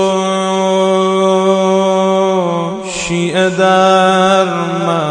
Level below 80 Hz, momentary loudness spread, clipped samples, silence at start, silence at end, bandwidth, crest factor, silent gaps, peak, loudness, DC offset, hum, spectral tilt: -50 dBFS; 7 LU; under 0.1%; 0 s; 0 s; 10 kHz; 12 dB; none; 0 dBFS; -12 LUFS; under 0.1%; none; -5 dB/octave